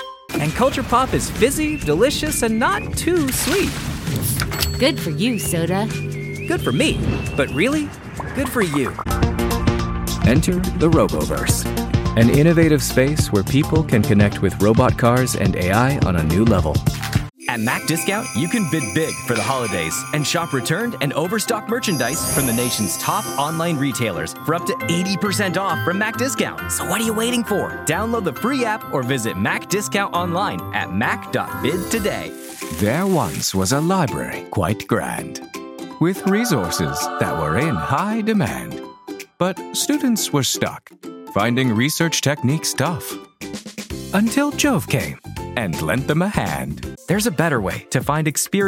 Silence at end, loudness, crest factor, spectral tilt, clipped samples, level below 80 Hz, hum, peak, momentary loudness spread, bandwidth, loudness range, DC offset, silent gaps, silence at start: 0 s; -19 LUFS; 16 dB; -5 dB/octave; under 0.1%; -36 dBFS; none; -4 dBFS; 8 LU; 17 kHz; 5 LU; under 0.1%; none; 0 s